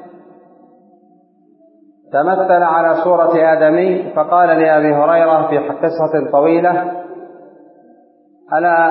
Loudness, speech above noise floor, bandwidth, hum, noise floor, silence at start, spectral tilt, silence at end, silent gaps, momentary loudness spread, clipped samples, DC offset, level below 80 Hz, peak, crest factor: -13 LUFS; 39 dB; 5.4 kHz; none; -51 dBFS; 0 s; -12 dB/octave; 0 s; none; 8 LU; under 0.1%; under 0.1%; -74 dBFS; 0 dBFS; 14 dB